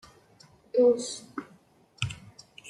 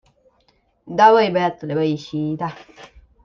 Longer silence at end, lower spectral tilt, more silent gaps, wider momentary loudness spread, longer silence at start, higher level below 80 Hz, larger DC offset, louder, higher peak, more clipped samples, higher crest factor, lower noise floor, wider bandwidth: second, 0 s vs 0.4 s; second, -4.5 dB/octave vs -6.5 dB/octave; neither; first, 21 LU vs 15 LU; about the same, 0.75 s vs 0.85 s; about the same, -62 dBFS vs -58 dBFS; neither; second, -28 LUFS vs -18 LUFS; second, -10 dBFS vs -2 dBFS; neither; about the same, 20 dB vs 18 dB; about the same, -60 dBFS vs -62 dBFS; first, 11.5 kHz vs 7 kHz